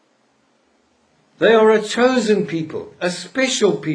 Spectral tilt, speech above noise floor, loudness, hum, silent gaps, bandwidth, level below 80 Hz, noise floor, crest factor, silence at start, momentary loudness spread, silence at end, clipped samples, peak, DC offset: -4 dB/octave; 44 dB; -17 LUFS; none; none; 10.5 kHz; -64 dBFS; -61 dBFS; 18 dB; 1.4 s; 11 LU; 0 s; under 0.1%; -2 dBFS; under 0.1%